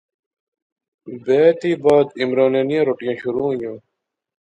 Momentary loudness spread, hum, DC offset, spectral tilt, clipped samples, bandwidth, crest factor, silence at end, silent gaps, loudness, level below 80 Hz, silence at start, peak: 12 LU; none; under 0.1%; -7 dB/octave; under 0.1%; 9.2 kHz; 18 dB; 0.75 s; none; -18 LUFS; -62 dBFS; 1.05 s; -2 dBFS